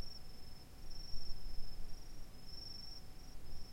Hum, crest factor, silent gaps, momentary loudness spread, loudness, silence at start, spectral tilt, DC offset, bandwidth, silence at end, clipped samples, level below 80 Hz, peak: none; 14 dB; none; 8 LU; -53 LUFS; 0 s; -4 dB/octave; under 0.1%; 15.5 kHz; 0 s; under 0.1%; -48 dBFS; -26 dBFS